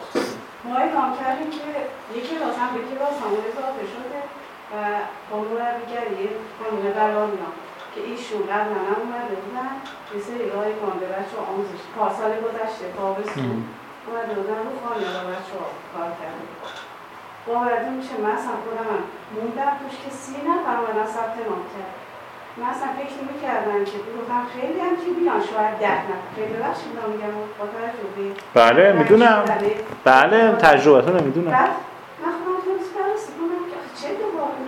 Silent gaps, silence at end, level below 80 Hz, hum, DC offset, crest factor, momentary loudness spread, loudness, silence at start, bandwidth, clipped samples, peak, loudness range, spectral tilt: none; 0 s; -64 dBFS; none; under 0.1%; 22 dB; 18 LU; -22 LUFS; 0 s; 16.5 kHz; under 0.1%; 0 dBFS; 12 LU; -5.5 dB/octave